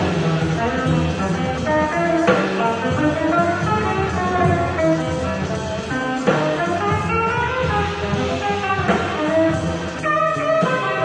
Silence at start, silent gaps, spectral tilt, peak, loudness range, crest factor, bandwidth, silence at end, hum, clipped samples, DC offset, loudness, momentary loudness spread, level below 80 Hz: 0 s; none; -6 dB/octave; -2 dBFS; 2 LU; 16 dB; 10 kHz; 0 s; none; under 0.1%; under 0.1%; -19 LUFS; 5 LU; -38 dBFS